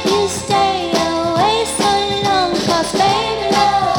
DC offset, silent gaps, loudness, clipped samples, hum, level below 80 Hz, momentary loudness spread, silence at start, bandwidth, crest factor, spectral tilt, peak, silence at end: under 0.1%; none; -15 LUFS; under 0.1%; none; -42 dBFS; 2 LU; 0 s; 19.5 kHz; 14 dB; -3.5 dB/octave; 0 dBFS; 0 s